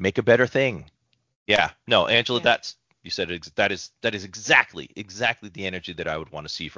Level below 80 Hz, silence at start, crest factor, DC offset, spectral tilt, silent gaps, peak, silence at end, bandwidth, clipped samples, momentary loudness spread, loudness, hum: -54 dBFS; 0 s; 22 dB; under 0.1%; -4 dB/octave; 1.36-1.46 s; -2 dBFS; 0.05 s; 7.6 kHz; under 0.1%; 14 LU; -23 LUFS; none